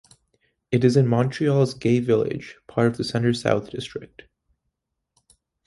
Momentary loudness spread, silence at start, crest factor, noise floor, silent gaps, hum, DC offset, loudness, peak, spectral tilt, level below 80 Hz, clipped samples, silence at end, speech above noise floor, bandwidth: 14 LU; 0.7 s; 18 dB; -79 dBFS; none; none; under 0.1%; -22 LUFS; -4 dBFS; -7 dB/octave; -58 dBFS; under 0.1%; 1.6 s; 58 dB; 11.5 kHz